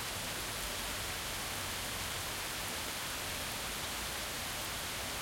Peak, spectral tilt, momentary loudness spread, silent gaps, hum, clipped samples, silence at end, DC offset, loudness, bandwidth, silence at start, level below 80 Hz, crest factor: -22 dBFS; -1.5 dB/octave; 0 LU; none; none; under 0.1%; 0 s; under 0.1%; -37 LUFS; 17 kHz; 0 s; -54 dBFS; 18 dB